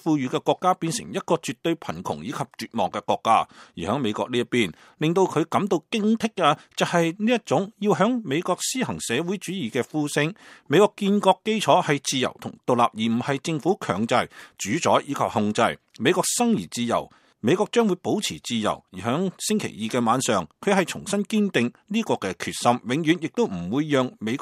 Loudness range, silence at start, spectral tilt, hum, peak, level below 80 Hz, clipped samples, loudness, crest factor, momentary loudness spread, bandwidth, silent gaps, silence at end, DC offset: 3 LU; 0.05 s; -4.5 dB/octave; none; -2 dBFS; -64 dBFS; under 0.1%; -24 LUFS; 20 dB; 7 LU; 15.5 kHz; none; 0 s; under 0.1%